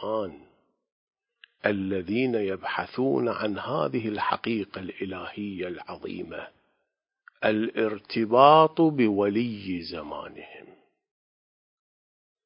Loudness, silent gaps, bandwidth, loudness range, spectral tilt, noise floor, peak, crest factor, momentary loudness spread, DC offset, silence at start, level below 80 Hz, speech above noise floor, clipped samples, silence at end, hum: -26 LUFS; 0.92-1.07 s; 5.4 kHz; 10 LU; -10 dB/octave; -80 dBFS; -4 dBFS; 24 dB; 18 LU; under 0.1%; 0 s; -62 dBFS; 55 dB; under 0.1%; 1.85 s; none